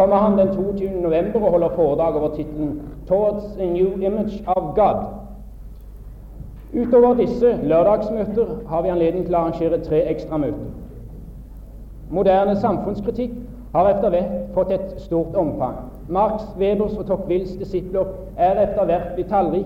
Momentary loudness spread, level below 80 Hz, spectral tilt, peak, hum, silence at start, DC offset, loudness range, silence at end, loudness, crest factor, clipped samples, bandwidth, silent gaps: 19 LU; -38 dBFS; -9.5 dB/octave; -4 dBFS; none; 0 s; under 0.1%; 4 LU; 0 s; -20 LUFS; 16 dB; under 0.1%; 15 kHz; none